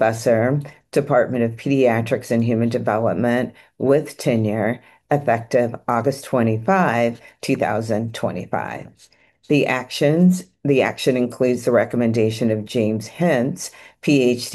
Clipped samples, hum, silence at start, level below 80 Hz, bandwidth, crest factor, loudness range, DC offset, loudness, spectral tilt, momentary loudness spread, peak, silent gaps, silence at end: under 0.1%; none; 0 s; -60 dBFS; 12.5 kHz; 16 dB; 3 LU; under 0.1%; -20 LUFS; -6.5 dB/octave; 8 LU; -4 dBFS; none; 0 s